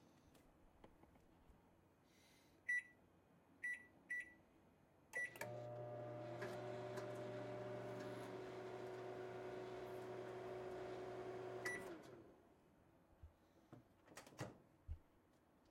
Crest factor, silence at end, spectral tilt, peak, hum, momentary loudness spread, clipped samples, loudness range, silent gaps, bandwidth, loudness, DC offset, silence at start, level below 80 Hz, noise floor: 20 dB; 0 s; -5.5 dB/octave; -34 dBFS; none; 19 LU; under 0.1%; 5 LU; none; 16 kHz; -51 LUFS; under 0.1%; 0 s; -74 dBFS; -75 dBFS